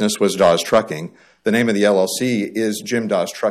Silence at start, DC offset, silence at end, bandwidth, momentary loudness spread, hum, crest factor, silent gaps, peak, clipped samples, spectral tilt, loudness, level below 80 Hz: 0 s; under 0.1%; 0 s; 15 kHz; 10 LU; none; 14 dB; none; -4 dBFS; under 0.1%; -4.5 dB/octave; -18 LUFS; -58 dBFS